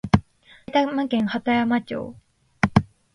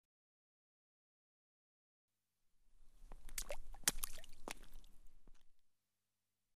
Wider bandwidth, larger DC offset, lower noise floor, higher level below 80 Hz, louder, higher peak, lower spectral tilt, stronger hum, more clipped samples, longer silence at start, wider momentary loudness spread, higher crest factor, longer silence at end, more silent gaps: second, 10.5 kHz vs 15 kHz; neither; second, -45 dBFS vs under -90 dBFS; first, -42 dBFS vs -56 dBFS; first, -23 LUFS vs -45 LUFS; first, 0 dBFS vs -16 dBFS; first, -7 dB/octave vs -0.5 dB/octave; neither; neither; about the same, 0.05 s vs 0.05 s; second, 9 LU vs 19 LU; second, 22 dB vs 34 dB; first, 0.3 s vs 0 s; second, none vs 0.05-2.08 s